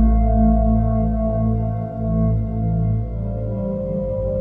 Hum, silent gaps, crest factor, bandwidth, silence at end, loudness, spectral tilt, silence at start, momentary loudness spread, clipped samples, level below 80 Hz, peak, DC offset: none; none; 12 dB; 2.2 kHz; 0 s; -21 LUFS; -13.5 dB/octave; 0 s; 8 LU; under 0.1%; -22 dBFS; -6 dBFS; under 0.1%